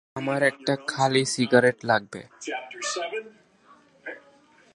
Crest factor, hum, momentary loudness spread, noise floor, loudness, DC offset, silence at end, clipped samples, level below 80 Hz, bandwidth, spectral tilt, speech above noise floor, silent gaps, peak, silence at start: 24 dB; none; 20 LU; -57 dBFS; -25 LUFS; under 0.1%; 0.55 s; under 0.1%; -70 dBFS; 11.5 kHz; -4 dB/octave; 32 dB; none; -4 dBFS; 0.15 s